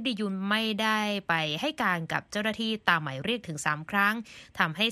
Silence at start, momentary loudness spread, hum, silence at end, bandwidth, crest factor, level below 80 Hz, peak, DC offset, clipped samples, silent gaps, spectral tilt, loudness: 0 s; 6 LU; none; 0 s; 14 kHz; 22 dB; -66 dBFS; -6 dBFS; under 0.1%; under 0.1%; none; -4 dB/octave; -28 LUFS